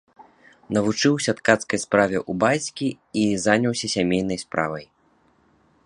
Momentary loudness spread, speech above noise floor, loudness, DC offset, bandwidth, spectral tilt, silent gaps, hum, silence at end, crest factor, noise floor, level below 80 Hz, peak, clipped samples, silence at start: 7 LU; 40 dB; -22 LUFS; under 0.1%; 11 kHz; -4.5 dB/octave; none; none; 1 s; 22 dB; -61 dBFS; -56 dBFS; 0 dBFS; under 0.1%; 0.2 s